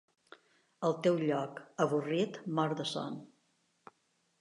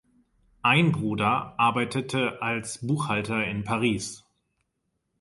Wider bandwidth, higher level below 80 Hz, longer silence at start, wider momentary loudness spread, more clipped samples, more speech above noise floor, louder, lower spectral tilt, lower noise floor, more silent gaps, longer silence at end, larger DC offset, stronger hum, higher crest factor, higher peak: about the same, 11.5 kHz vs 11.5 kHz; second, -86 dBFS vs -58 dBFS; first, 0.8 s vs 0.65 s; about the same, 10 LU vs 8 LU; neither; second, 43 dB vs 52 dB; second, -34 LUFS vs -25 LUFS; about the same, -6 dB/octave vs -5 dB/octave; about the same, -76 dBFS vs -78 dBFS; neither; about the same, 1.15 s vs 1.05 s; neither; neither; about the same, 20 dB vs 20 dB; second, -16 dBFS vs -8 dBFS